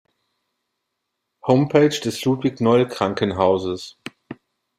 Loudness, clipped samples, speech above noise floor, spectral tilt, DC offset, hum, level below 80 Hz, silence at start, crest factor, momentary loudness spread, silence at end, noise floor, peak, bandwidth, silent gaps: -19 LUFS; under 0.1%; 60 dB; -6 dB/octave; under 0.1%; none; -60 dBFS; 1.45 s; 20 dB; 15 LU; 0.45 s; -78 dBFS; -2 dBFS; 15.5 kHz; none